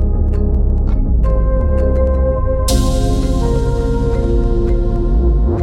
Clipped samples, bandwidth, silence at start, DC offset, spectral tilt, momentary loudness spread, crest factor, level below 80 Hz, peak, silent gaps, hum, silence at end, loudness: under 0.1%; 13 kHz; 0 s; under 0.1%; -7 dB/octave; 2 LU; 12 dB; -14 dBFS; -2 dBFS; none; none; 0 s; -16 LUFS